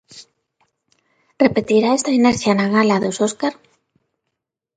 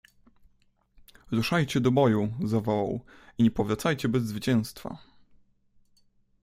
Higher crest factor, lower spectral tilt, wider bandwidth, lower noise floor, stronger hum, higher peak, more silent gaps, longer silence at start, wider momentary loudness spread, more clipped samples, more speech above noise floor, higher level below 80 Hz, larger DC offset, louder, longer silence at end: about the same, 18 dB vs 20 dB; second, -5 dB/octave vs -6.5 dB/octave; second, 9.4 kHz vs 15.5 kHz; first, -79 dBFS vs -66 dBFS; neither; first, 0 dBFS vs -8 dBFS; neither; second, 0.15 s vs 1.3 s; second, 5 LU vs 15 LU; neither; first, 63 dB vs 40 dB; about the same, -56 dBFS vs -56 dBFS; neither; first, -17 LUFS vs -27 LUFS; second, 1.25 s vs 1.45 s